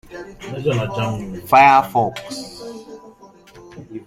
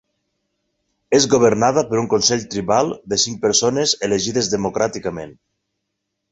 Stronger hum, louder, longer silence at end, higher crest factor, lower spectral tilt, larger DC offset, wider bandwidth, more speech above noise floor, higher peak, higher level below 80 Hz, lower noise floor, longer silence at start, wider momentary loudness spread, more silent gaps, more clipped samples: neither; about the same, -16 LUFS vs -17 LUFS; second, 0.05 s vs 1 s; about the same, 18 dB vs 18 dB; first, -5.5 dB/octave vs -3.5 dB/octave; neither; first, 16 kHz vs 8.2 kHz; second, 27 dB vs 59 dB; about the same, 0 dBFS vs -2 dBFS; about the same, -50 dBFS vs -52 dBFS; second, -45 dBFS vs -77 dBFS; second, 0.1 s vs 1.1 s; first, 24 LU vs 8 LU; neither; neither